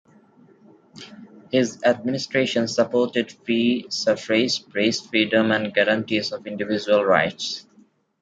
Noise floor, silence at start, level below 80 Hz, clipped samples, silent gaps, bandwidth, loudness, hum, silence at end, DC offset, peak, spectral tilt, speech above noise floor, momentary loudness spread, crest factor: -57 dBFS; 0.95 s; -66 dBFS; under 0.1%; none; 9.2 kHz; -22 LUFS; none; 0.6 s; under 0.1%; -2 dBFS; -4 dB/octave; 35 dB; 10 LU; 20 dB